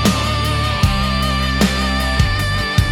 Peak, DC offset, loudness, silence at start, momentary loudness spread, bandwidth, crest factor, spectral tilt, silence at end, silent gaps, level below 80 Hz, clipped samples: -2 dBFS; under 0.1%; -17 LUFS; 0 s; 2 LU; 18 kHz; 14 dB; -4.5 dB/octave; 0 s; none; -22 dBFS; under 0.1%